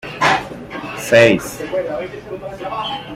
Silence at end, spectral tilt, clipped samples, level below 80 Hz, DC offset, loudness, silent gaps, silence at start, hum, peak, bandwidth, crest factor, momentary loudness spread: 0 s; -4.5 dB/octave; under 0.1%; -48 dBFS; under 0.1%; -17 LUFS; none; 0.05 s; none; 0 dBFS; 16 kHz; 18 dB; 18 LU